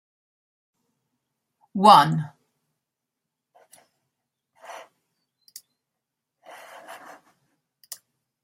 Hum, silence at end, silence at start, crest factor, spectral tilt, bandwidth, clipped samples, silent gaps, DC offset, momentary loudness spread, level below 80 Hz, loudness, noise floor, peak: none; 1.5 s; 1.75 s; 28 dB; -5 dB/octave; 16 kHz; under 0.1%; none; under 0.1%; 30 LU; -74 dBFS; -17 LUFS; -84 dBFS; 0 dBFS